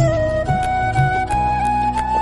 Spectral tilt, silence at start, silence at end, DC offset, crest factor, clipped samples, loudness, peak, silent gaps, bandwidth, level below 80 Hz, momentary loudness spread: -6.5 dB/octave; 0 s; 0 s; under 0.1%; 12 dB; under 0.1%; -18 LUFS; -4 dBFS; none; 12 kHz; -30 dBFS; 2 LU